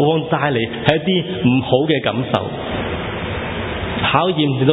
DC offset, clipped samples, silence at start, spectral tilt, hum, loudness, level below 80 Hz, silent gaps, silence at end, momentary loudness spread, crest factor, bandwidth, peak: under 0.1%; under 0.1%; 0 s; -8.5 dB/octave; none; -18 LUFS; -38 dBFS; none; 0 s; 8 LU; 18 dB; 6.2 kHz; 0 dBFS